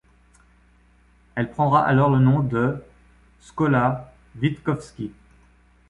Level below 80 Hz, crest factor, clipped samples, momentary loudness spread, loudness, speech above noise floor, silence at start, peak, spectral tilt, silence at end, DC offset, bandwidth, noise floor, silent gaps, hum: -52 dBFS; 18 dB; under 0.1%; 18 LU; -21 LUFS; 36 dB; 1.35 s; -6 dBFS; -8.5 dB/octave; 0.8 s; under 0.1%; 10.5 kHz; -56 dBFS; none; 60 Hz at -50 dBFS